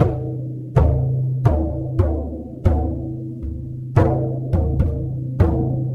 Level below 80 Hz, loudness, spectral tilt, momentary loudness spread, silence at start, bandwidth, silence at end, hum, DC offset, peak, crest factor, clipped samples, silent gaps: -26 dBFS; -21 LUFS; -10.5 dB/octave; 11 LU; 0 s; 4.2 kHz; 0 s; none; under 0.1%; 0 dBFS; 18 dB; under 0.1%; none